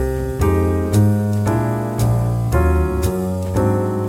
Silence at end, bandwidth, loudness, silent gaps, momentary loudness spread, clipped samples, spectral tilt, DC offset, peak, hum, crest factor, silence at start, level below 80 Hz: 0 s; 16.5 kHz; -18 LUFS; none; 5 LU; under 0.1%; -8 dB/octave; under 0.1%; -4 dBFS; none; 12 dB; 0 s; -26 dBFS